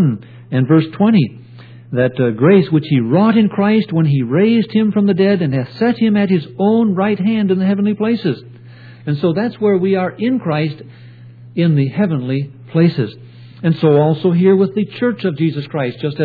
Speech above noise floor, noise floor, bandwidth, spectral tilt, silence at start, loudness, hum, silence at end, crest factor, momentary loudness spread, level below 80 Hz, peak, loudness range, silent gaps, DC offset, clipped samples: 23 dB; -37 dBFS; 4.9 kHz; -11 dB/octave; 0 s; -15 LUFS; none; 0 s; 14 dB; 9 LU; -58 dBFS; 0 dBFS; 4 LU; none; under 0.1%; under 0.1%